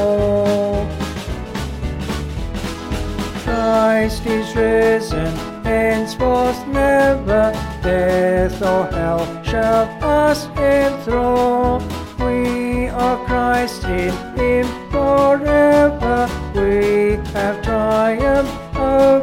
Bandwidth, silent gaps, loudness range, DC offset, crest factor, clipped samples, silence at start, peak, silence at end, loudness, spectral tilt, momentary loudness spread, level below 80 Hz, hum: 16.5 kHz; none; 4 LU; under 0.1%; 14 dB; under 0.1%; 0 s; -4 dBFS; 0 s; -17 LUFS; -6 dB/octave; 10 LU; -30 dBFS; none